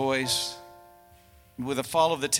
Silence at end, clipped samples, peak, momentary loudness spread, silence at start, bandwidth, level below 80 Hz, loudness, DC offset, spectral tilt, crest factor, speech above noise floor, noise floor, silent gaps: 0 s; under 0.1%; -8 dBFS; 18 LU; 0 s; 17.5 kHz; -60 dBFS; -27 LUFS; under 0.1%; -2.5 dB/octave; 20 dB; 30 dB; -56 dBFS; none